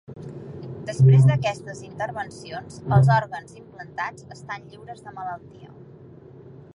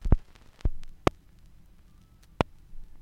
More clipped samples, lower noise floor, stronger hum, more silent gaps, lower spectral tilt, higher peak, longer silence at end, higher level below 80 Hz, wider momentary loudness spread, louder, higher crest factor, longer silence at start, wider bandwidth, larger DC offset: neither; second, -45 dBFS vs -55 dBFS; neither; neither; about the same, -7.5 dB/octave vs -7 dB/octave; about the same, -4 dBFS vs -4 dBFS; first, 1.1 s vs 0 s; second, -56 dBFS vs -34 dBFS; first, 23 LU vs 7 LU; first, -21 LUFS vs -32 LUFS; second, 18 dB vs 28 dB; about the same, 0.1 s vs 0 s; second, 10.5 kHz vs 12 kHz; neither